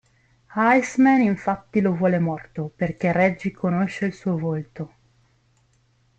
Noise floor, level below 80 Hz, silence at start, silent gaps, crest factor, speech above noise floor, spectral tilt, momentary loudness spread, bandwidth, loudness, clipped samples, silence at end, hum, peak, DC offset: -63 dBFS; -58 dBFS; 0.5 s; none; 18 dB; 41 dB; -7.5 dB/octave; 14 LU; 8.6 kHz; -22 LUFS; under 0.1%; 1.3 s; none; -6 dBFS; under 0.1%